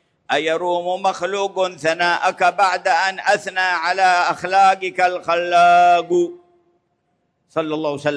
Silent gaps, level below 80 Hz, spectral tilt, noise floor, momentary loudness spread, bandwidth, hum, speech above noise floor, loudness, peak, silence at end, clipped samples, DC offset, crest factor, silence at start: none; -70 dBFS; -3.5 dB/octave; -68 dBFS; 8 LU; 10.5 kHz; none; 51 dB; -17 LUFS; -4 dBFS; 0 s; under 0.1%; under 0.1%; 14 dB; 0.3 s